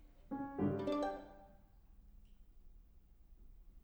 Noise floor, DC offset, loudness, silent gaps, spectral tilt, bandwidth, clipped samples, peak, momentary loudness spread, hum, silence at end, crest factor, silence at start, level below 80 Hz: -63 dBFS; under 0.1%; -41 LUFS; none; -8 dB/octave; over 20 kHz; under 0.1%; -24 dBFS; 25 LU; none; 0.05 s; 20 dB; 0 s; -62 dBFS